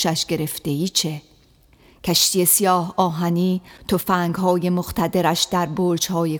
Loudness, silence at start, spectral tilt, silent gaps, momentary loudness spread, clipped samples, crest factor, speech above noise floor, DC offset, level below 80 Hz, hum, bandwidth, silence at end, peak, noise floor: -20 LUFS; 0 s; -4 dB/octave; none; 9 LU; under 0.1%; 18 dB; 34 dB; under 0.1%; -50 dBFS; none; over 20 kHz; 0 s; -4 dBFS; -54 dBFS